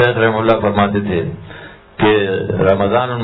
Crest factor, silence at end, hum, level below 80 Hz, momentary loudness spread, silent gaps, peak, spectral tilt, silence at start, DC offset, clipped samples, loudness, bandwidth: 14 dB; 0 s; none; -42 dBFS; 19 LU; none; 0 dBFS; -9.5 dB/octave; 0 s; under 0.1%; under 0.1%; -15 LUFS; 5.4 kHz